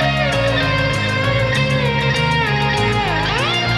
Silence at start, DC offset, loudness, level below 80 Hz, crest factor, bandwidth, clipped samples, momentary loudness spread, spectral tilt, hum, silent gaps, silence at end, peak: 0 s; under 0.1%; -16 LUFS; -32 dBFS; 12 dB; 13 kHz; under 0.1%; 1 LU; -5 dB/octave; none; none; 0 s; -4 dBFS